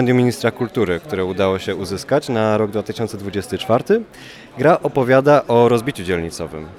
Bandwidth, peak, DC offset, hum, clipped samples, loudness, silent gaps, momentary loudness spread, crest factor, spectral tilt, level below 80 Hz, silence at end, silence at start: 15.5 kHz; -2 dBFS; under 0.1%; none; under 0.1%; -18 LUFS; none; 11 LU; 16 dB; -6.5 dB/octave; -50 dBFS; 0 s; 0 s